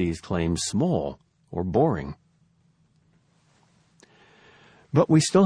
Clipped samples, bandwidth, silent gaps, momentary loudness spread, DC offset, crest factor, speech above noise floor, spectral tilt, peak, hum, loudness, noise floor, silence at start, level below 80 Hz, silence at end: under 0.1%; 10.5 kHz; none; 18 LU; under 0.1%; 20 dB; 41 dB; -6 dB/octave; -6 dBFS; none; -24 LUFS; -64 dBFS; 0 s; -50 dBFS; 0 s